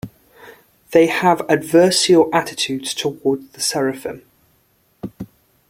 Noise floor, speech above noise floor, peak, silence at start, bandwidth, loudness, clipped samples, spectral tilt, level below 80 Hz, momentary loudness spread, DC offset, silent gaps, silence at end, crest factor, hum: -60 dBFS; 43 dB; -2 dBFS; 0.05 s; 16.5 kHz; -17 LUFS; under 0.1%; -4 dB/octave; -58 dBFS; 22 LU; under 0.1%; none; 0.45 s; 18 dB; none